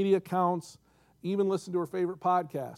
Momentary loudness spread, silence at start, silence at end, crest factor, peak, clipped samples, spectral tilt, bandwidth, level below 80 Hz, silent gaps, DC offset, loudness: 9 LU; 0 s; 0 s; 16 dB; -14 dBFS; under 0.1%; -7 dB/octave; 14 kHz; -74 dBFS; none; under 0.1%; -30 LUFS